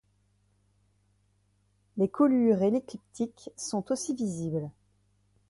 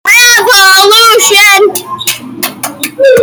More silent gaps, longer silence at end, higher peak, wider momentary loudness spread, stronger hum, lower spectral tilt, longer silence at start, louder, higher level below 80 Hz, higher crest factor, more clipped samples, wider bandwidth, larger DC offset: neither; first, 0.8 s vs 0 s; second, -12 dBFS vs 0 dBFS; about the same, 15 LU vs 13 LU; first, 50 Hz at -55 dBFS vs none; first, -6.5 dB/octave vs 0 dB/octave; first, 1.95 s vs 0.05 s; second, -29 LUFS vs -3 LUFS; second, -68 dBFS vs -50 dBFS; first, 18 dB vs 6 dB; second, under 0.1% vs 2%; second, 11.5 kHz vs over 20 kHz; neither